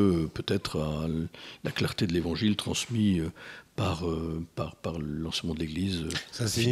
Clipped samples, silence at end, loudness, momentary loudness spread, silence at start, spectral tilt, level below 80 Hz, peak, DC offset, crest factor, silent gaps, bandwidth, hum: under 0.1%; 0 s; -31 LUFS; 8 LU; 0 s; -5.5 dB/octave; -52 dBFS; -12 dBFS; under 0.1%; 18 dB; none; 15 kHz; none